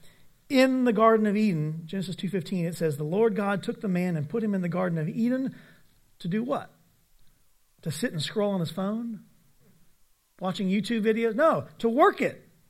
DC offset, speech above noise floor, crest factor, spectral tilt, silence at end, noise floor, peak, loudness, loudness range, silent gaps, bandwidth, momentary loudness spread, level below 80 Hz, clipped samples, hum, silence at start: under 0.1%; 37 dB; 20 dB; -6.5 dB/octave; 0.3 s; -62 dBFS; -6 dBFS; -27 LUFS; 7 LU; none; 15 kHz; 12 LU; -68 dBFS; under 0.1%; none; 0.05 s